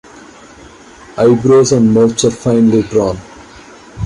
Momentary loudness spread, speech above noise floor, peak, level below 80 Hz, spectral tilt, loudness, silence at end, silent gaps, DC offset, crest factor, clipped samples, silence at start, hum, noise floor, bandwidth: 9 LU; 27 dB; 0 dBFS; -42 dBFS; -6 dB/octave; -11 LUFS; 0 s; none; under 0.1%; 12 dB; under 0.1%; 1.15 s; none; -37 dBFS; 11.5 kHz